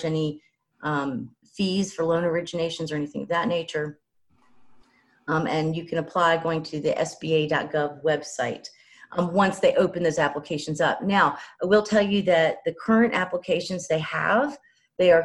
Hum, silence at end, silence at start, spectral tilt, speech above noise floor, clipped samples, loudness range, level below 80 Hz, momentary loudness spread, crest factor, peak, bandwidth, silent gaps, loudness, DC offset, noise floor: none; 0 s; 0 s; -5.5 dB/octave; 40 dB; under 0.1%; 6 LU; -62 dBFS; 10 LU; 18 dB; -6 dBFS; 11.5 kHz; none; -24 LUFS; under 0.1%; -63 dBFS